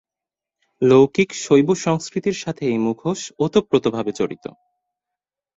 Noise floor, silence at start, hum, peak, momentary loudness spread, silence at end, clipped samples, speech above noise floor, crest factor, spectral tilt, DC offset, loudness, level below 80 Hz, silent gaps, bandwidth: -88 dBFS; 0.8 s; none; -2 dBFS; 11 LU; 1.2 s; under 0.1%; 70 dB; 18 dB; -5.5 dB/octave; under 0.1%; -19 LUFS; -58 dBFS; none; 8 kHz